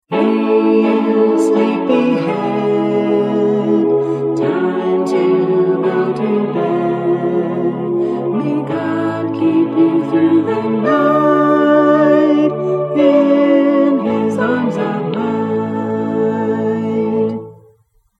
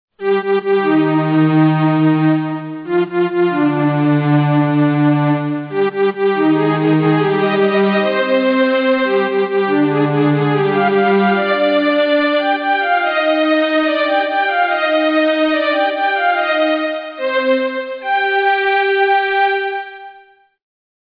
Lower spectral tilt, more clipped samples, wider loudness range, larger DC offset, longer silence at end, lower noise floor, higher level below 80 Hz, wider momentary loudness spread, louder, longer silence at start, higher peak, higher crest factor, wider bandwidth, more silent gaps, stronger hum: second, -8 dB/octave vs -9.5 dB/octave; neither; first, 5 LU vs 2 LU; neither; second, 0.65 s vs 0.85 s; first, -54 dBFS vs -47 dBFS; first, -62 dBFS vs -68 dBFS; about the same, 7 LU vs 5 LU; about the same, -15 LUFS vs -15 LUFS; about the same, 0.1 s vs 0.2 s; about the same, 0 dBFS vs -2 dBFS; about the same, 14 dB vs 12 dB; first, 9.8 kHz vs 5.2 kHz; neither; neither